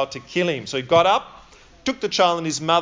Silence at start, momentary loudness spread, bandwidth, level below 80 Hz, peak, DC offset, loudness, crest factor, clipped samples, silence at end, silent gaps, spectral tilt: 0 s; 10 LU; 7.6 kHz; -56 dBFS; -2 dBFS; under 0.1%; -21 LUFS; 18 dB; under 0.1%; 0 s; none; -4 dB/octave